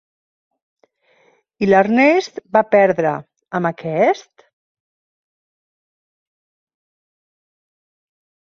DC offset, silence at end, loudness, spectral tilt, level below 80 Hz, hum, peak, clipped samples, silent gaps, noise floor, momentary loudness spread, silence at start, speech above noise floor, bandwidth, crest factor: under 0.1%; 4.35 s; -16 LUFS; -6.5 dB/octave; -64 dBFS; none; -2 dBFS; under 0.1%; none; -58 dBFS; 10 LU; 1.6 s; 42 dB; 7.2 kHz; 20 dB